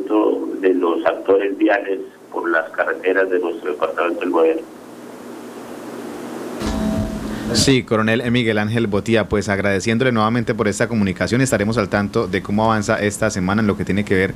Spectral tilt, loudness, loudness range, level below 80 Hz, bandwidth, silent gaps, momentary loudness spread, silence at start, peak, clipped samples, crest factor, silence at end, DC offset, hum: -5.5 dB/octave; -18 LUFS; 5 LU; -42 dBFS; 15.5 kHz; none; 13 LU; 0 s; 0 dBFS; under 0.1%; 18 dB; 0 s; under 0.1%; none